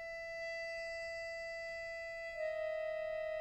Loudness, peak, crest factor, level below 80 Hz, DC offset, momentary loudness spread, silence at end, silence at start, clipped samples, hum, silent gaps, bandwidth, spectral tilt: -42 LUFS; -32 dBFS; 10 dB; -66 dBFS; under 0.1%; 4 LU; 0 s; 0 s; under 0.1%; none; none; 11 kHz; -1.5 dB/octave